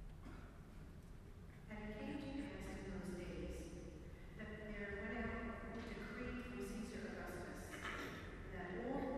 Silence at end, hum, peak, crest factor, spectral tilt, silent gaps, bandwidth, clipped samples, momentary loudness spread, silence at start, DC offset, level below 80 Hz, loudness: 0 s; none; -32 dBFS; 18 dB; -6 dB/octave; none; 13.5 kHz; under 0.1%; 13 LU; 0 s; under 0.1%; -56 dBFS; -50 LUFS